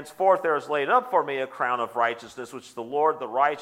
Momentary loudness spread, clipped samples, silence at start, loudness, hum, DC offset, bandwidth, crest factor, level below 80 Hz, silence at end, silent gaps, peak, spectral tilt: 15 LU; under 0.1%; 0 s; -24 LUFS; none; under 0.1%; 16 kHz; 18 dB; -78 dBFS; 0 s; none; -8 dBFS; -4.5 dB/octave